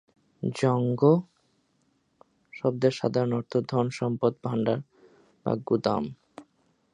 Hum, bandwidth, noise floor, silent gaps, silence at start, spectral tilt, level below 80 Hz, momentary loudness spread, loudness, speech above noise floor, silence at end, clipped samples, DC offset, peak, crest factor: none; 10.5 kHz; -70 dBFS; none; 0.4 s; -7.5 dB/octave; -66 dBFS; 11 LU; -27 LUFS; 45 dB; 0.5 s; under 0.1%; under 0.1%; -6 dBFS; 22 dB